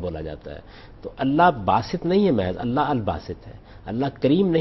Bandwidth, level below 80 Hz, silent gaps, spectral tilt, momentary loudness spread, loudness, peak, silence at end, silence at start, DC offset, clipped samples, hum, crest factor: 6 kHz; -44 dBFS; none; -8.5 dB/octave; 21 LU; -22 LUFS; -4 dBFS; 0 s; 0 s; under 0.1%; under 0.1%; none; 18 dB